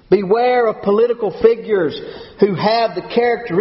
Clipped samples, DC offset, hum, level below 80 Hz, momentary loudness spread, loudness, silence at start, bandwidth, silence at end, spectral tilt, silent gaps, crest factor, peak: under 0.1%; under 0.1%; none; -52 dBFS; 4 LU; -16 LUFS; 0.1 s; 5.8 kHz; 0 s; -4.5 dB/octave; none; 16 dB; 0 dBFS